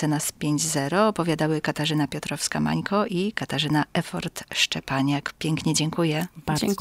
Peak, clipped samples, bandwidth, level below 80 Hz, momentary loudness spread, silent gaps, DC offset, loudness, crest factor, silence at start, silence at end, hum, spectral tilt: -6 dBFS; under 0.1%; 16 kHz; -54 dBFS; 5 LU; none; under 0.1%; -25 LUFS; 18 dB; 0 s; 0 s; none; -4.5 dB/octave